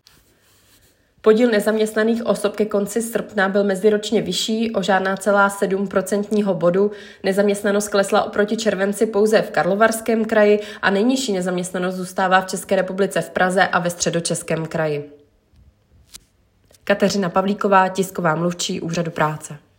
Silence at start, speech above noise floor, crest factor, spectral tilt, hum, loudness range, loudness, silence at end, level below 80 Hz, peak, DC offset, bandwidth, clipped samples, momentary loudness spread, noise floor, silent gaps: 1.25 s; 40 dB; 18 dB; -4.5 dB/octave; none; 4 LU; -19 LUFS; 0.2 s; -58 dBFS; 0 dBFS; under 0.1%; 16.5 kHz; under 0.1%; 7 LU; -58 dBFS; none